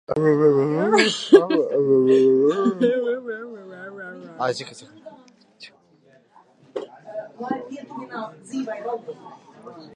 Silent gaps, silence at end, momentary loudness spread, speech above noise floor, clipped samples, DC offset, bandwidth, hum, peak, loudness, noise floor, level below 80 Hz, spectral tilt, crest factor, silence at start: none; 0.1 s; 22 LU; 36 dB; under 0.1%; under 0.1%; 11 kHz; none; 0 dBFS; -20 LUFS; -56 dBFS; -70 dBFS; -5.5 dB/octave; 22 dB; 0.1 s